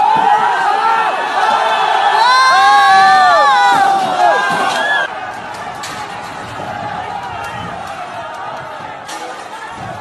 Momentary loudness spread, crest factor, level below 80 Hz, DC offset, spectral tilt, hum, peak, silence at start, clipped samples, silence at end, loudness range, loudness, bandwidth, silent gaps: 18 LU; 12 dB; -52 dBFS; under 0.1%; -2 dB/octave; none; 0 dBFS; 0 s; under 0.1%; 0 s; 15 LU; -11 LUFS; 12.5 kHz; none